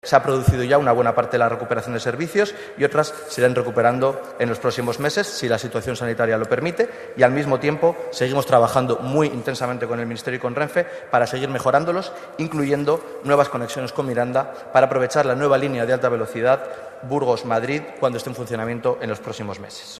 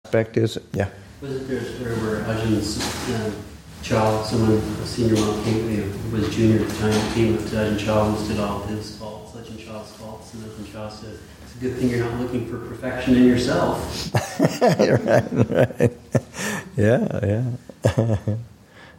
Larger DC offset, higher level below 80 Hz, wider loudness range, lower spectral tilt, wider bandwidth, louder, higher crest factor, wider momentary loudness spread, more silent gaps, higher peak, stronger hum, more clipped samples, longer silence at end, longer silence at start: neither; second, -50 dBFS vs -42 dBFS; second, 3 LU vs 9 LU; about the same, -5.5 dB/octave vs -6 dB/octave; second, 14 kHz vs 17 kHz; about the same, -21 LUFS vs -22 LUFS; about the same, 20 dB vs 20 dB; second, 8 LU vs 17 LU; neither; about the same, 0 dBFS vs -2 dBFS; neither; neither; about the same, 0 s vs 0.05 s; about the same, 0.05 s vs 0.05 s